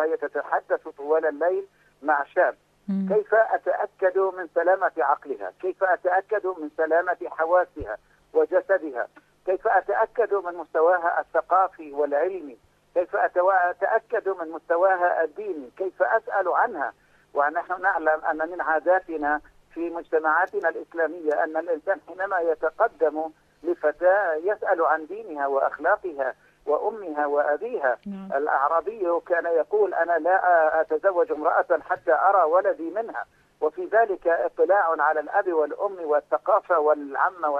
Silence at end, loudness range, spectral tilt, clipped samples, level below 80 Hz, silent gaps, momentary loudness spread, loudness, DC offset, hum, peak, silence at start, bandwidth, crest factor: 0 s; 3 LU; -8 dB/octave; under 0.1%; -64 dBFS; none; 10 LU; -24 LUFS; under 0.1%; 50 Hz at -70 dBFS; -8 dBFS; 0 s; 5.6 kHz; 16 dB